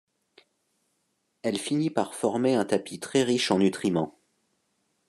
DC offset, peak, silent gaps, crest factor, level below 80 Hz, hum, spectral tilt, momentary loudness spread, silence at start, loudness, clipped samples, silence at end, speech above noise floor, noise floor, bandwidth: under 0.1%; -8 dBFS; none; 20 dB; -72 dBFS; none; -5 dB/octave; 7 LU; 1.45 s; -26 LUFS; under 0.1%; 1 s; 50 dB; -75 dBFS; 12.5 kHz